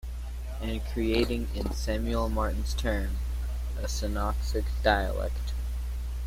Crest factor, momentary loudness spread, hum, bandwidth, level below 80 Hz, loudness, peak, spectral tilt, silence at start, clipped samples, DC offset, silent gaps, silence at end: 20 dB; 8 LU; 60 Hz at -30 dBFS; 16 kHz; -30 dBFS; -31 LUFS; -8 dBFS; -5.5 dB/octave; 0.05 s; under 0.1%; under 0.1%; none; 0 s